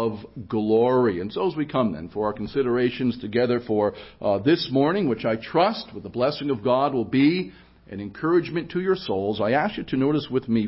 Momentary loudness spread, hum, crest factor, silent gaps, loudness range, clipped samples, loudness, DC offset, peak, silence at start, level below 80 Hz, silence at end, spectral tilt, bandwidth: 8 LU; none; 16 dB; none; 2 LU; under 0.1%; -24 LUFS; under 0.1%; -8 dBFS; 0 s; -54 dBFS; 0 s; -11 dB/octave; 5.8 kHz